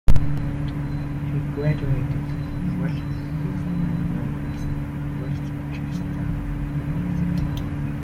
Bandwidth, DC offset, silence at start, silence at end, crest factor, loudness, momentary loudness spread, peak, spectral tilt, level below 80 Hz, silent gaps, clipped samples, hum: 7 kHz; under 0.1%; 0.05 s; 0 s; 20 dB; -26 LUFS; 5 LU; -2 dBFS; -8.5 dB/octave; -30 dBFS; none; under 0.1%; none